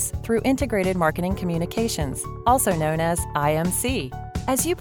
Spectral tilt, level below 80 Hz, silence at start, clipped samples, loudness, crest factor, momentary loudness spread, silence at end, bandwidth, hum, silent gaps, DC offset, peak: -4.5 dB/octave; -38 dBFS; 0 s; under 0.1%; -23 LUFS; 18 dB; 6 LU; 0 s; 20 kHz; none; none; 0.3%; -6 dBFS